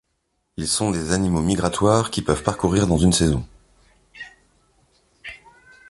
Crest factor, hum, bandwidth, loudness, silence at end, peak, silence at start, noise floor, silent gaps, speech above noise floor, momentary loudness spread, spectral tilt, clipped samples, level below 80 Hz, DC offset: 22 dB; none; 11.5 kHz; -20 LUFS; 0.55 s; 0 dBFS; 0.6 s; -72 dBFS; none; 52 dB; 22 LU; -5 dB/octave; under 0.1%; -38 dBFS; under 0.1%